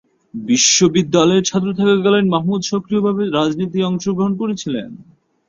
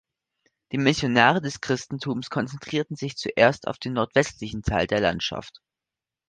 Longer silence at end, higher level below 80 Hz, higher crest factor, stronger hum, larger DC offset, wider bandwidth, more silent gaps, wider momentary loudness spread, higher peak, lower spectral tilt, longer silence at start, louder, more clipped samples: second, 0.45 s vs 0.8 s; second, -56 dBFS vs -48 dBFS; second, 14 dB vs 24 dB; neither; neither; second, 7.6 kHz vs 9.8 kHz; neither; about the same, 11 LU vs 11 LU; about the same, -2 dBFS vs -2 dBFS; about the same, -4 dB/octave vs -5 dB/octave; second, 0.35 s vs 0.7 s; first, -16 LUFS vs -24 LUFS; neither